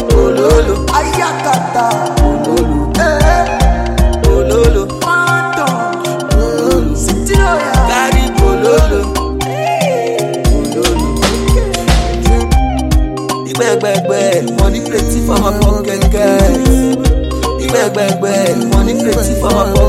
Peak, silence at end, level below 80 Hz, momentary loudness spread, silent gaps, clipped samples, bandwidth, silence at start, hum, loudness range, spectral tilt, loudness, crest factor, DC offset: 0 dBFS; 0 s; -16 dBFS; 5 LU; none; under 0.1%; 15.5 kHz; 0 s; none; 1 LU; -5.5 dB/octave; -12 LUFS; 10 dB; under 0.1%